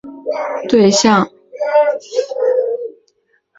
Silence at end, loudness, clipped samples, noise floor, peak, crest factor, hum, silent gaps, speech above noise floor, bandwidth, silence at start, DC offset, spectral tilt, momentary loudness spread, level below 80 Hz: 0.7 s; -15 LUFS; under 0.1%; -61 dBFS; -2 dBFS; 14 dB; none; none; 47 dB; 7.8 kHz; 0.05 s; under 0.1%; -4 dB/octave; 13 LU; -56 dBFS